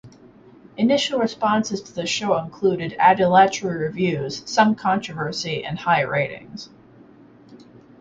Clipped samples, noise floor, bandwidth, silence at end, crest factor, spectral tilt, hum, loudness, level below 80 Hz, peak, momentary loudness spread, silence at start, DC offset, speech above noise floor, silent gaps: under 0.1%; -48 dBFS; 9.2 kHz; 0.45 s; 20 dB; -4.5 dB/octave; none; -21 LUFS; -58 dBFS; -2 dBFS; 11 LU; 0.05 s; under 0.1%; 28 dB; none